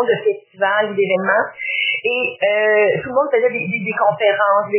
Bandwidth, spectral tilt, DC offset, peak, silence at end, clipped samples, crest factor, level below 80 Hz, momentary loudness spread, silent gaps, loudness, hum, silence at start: 3.2 kHz; -8 dB/octave; under 0.1%; -2 dBFS; 0 s; under 0.1%; 14 dB; -64 dBFS; 6 LU; none; -17 LUFS; none; 0 s